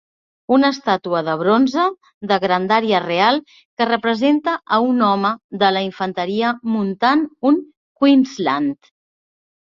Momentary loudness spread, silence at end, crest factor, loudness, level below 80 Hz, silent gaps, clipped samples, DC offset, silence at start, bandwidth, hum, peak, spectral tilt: 6 LU; 1 s; 18 dB; -18 LUFS; -64 dBFS; 2.14-2.21 s, 3.65-3.77 s, 5.44-5.49 s, 7.77-7.95 s; under 0.1%; under 0.1%; 0.5 s; 7.2 kHz; none; 0 dBFS; -6 dB/octave